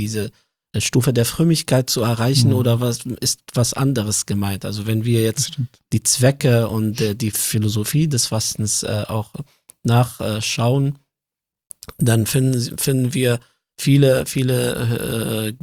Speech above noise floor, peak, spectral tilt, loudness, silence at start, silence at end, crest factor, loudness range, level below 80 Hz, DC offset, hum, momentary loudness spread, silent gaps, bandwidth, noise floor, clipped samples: 68 dB; -2 dBFS; -5 dB/octave; -19 LUFS; 0 s; 0.05 s; 18 dB; 3 LU; -50 dBFS; under 0.1%; none; 9 LU; none; 16.5 kHz; -86 dBFS; under 0.1%